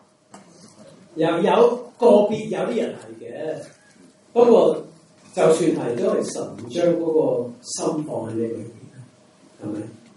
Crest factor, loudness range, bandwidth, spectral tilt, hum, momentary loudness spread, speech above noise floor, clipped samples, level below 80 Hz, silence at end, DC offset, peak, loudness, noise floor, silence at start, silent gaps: 20 dB; 5 LU; 11.5 kHz; -5.5 dB/octave; none; 17 LU; 32 dB; under 0.1%; -72 dBFS; 0.25 s; under 0.1%; -2 dBFS; -21 LUFS; -52 dBFS; 0.35 s; none